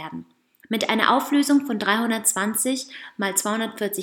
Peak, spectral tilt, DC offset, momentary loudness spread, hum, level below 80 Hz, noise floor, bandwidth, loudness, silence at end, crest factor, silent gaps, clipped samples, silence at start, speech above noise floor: 0 dBFS; -2.5 dB/octave; under 0.1%; 10 LU; none; -74 dBFS; -50 dBFS; 19 kHz; -22 LUFS; 0 s; 22 dB; none; under 0.1%; 0 s; 28 dB